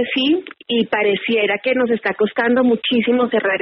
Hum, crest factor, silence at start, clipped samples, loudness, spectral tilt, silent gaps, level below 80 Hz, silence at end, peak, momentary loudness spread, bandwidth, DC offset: none; 12 dB; 0 s; under 0.1%; -17 LUFS; -2 dB/octave; none; -62 dBFS; 0 s; -6 dBFS; 3 LU; 5.8 kHz; under 0.1%